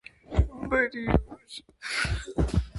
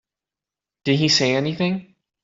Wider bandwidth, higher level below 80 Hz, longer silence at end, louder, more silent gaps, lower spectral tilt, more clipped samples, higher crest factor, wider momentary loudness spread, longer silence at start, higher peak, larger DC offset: first, 11.5 kHz vs 7.8 kHz; first, -34 dBFS vs -60 dBFS; second, 0 s vs 0.4 s; second, -28 LUFS vs -20 LUFS; neither; first, -6 dB/octave vs -4.5 dB/octave; neither; about the same, 22 dB vs 18 dB; first, 15 LU vs 12 LU; second, 0.3 s vs 0.85 s; about the same, -6 dBFS vs -4 dBFS; neither